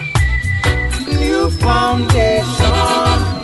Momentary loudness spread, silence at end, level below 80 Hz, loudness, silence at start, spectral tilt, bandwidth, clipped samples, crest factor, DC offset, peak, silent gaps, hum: 3 LU; 0 s; -20 dBFS; -14 LUFS; 0 s; -5 dB/octave; 11.5 kHz; under 0.1%; 14 dB; under 0.1%; 0 dBFS; none; none